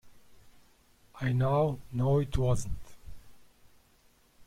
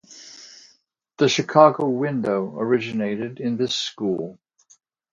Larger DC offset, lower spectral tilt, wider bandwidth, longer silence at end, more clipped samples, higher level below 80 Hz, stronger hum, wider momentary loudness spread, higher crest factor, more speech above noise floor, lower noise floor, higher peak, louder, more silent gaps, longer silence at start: neither; first, -7.5 dB/octave vs -5 dB/octave; first, 14 kHz vs 7.6 kHz; second, 0.05 s vs 0.8 s; neither; first, -44 dBFS vs -68 dBFS; neither; second, 10 LU vs 22 LU; about the same, 18 dB vs 22 dB; second, 36 dB vs 41 dB; about the same, -64 dBFS vs -62 dBFS; second, -14 dBFS vs 0 dBFS; second, -30 LUFS vs -21 LUFS; neither; about the same, 0.05 s vs 0.1 s